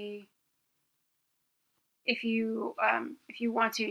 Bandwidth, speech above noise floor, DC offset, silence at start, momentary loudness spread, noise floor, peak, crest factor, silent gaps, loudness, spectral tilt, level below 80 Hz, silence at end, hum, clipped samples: 13 kHz; 47 dB; under 0.1%; 0 s; 14 LU; -79 dBFS; -12 dBFS; 22 dB; none; -31 LUFS; -4 dB/octave; -86 dBFS; 0 s; none; under 0.1%